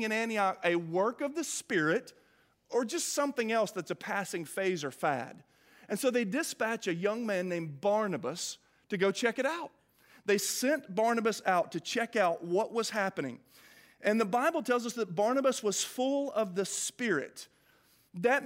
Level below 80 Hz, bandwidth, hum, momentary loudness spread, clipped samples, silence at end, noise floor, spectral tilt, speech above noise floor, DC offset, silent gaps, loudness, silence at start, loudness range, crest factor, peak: -84 dBFS; 16 kHz; none; 8 LU; under 0.1%; 0 s; -66 dBFS; -3.5 dB/octave; 35 dB; under 0.1%; none; -32 LUFS; 0 s; 3 LU; 20 dB; -14 dBFS